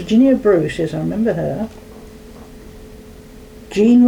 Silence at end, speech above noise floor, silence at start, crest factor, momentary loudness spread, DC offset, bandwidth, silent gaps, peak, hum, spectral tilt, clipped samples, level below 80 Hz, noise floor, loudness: 0 s; 24 dB; 0 s; 12 dB; 26 LU; under 0.1%; 11 kHz; none; -4 dBFS; none; -7.5 dB/octave; under 0.1%; -42 dBFS; -38 dBFS; -17 LUFS